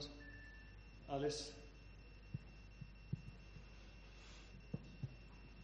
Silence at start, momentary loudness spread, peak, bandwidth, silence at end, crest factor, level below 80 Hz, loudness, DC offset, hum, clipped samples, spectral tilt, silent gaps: 0 s; 16 LU; -30 dBFS; 8 kHz; 0 s; 22 dB; -60 dBFS; -52 LUFS; under 0.1%; none; under 0.1%; -5 dB/octave; none